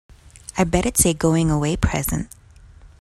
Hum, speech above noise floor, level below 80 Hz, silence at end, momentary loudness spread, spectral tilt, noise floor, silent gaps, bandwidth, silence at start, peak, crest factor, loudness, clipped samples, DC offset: none; 27 dB; -34 dBFS; 0.15 s; 13 LU; -5 dB/octave; -46 dBFS; none; 14.5 kHz; 0.1 s; -2 dBFS; 18 dB; -20 LUFS; under 0.1%; under 0.1%